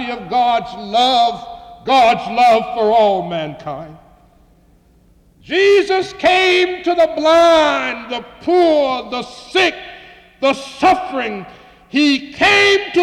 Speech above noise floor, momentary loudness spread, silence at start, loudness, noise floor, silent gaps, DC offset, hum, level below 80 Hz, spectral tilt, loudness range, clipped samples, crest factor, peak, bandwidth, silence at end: 36 dB; 15 LU; 0 s; -14 LUFS; -51 dBFS; none; under 0.1%; none; -50 dBFS; -3.5 dB/octave; 5 LU; under 0.1%; 12 dB; -4 dBFS; 12.5 kHz; 0 s